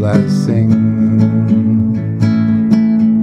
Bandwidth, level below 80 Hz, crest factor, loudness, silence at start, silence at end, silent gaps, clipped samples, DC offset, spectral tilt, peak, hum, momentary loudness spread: 7.8 kHz; -44 dBFS; 10 dB; -12 LUFS; 0 s; 0 s; none; under 0.1%; under 0.1%; -9 dB/octave; 0 dBFS; none; 3 LU